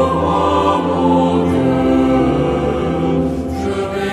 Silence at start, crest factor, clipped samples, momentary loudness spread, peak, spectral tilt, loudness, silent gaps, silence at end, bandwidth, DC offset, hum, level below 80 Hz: 0 s; 12 dB; under 0.1%; 6 LU; -2 dBFS; -7.5 dB/octave; -15 LUFS; none; 0 s; 11.5 kHz; under 0.1%; none; -32 dBFS